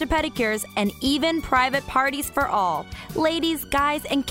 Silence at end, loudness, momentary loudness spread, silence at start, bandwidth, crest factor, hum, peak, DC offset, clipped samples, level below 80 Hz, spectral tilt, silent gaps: 0 s; -23 LUFS; 4 LU; 0 s; 16 kHz; 16 dB; none; -6 dBFS; under 0.1%; under 0.1%; -42 dBFS; -3.5 dB/octave; none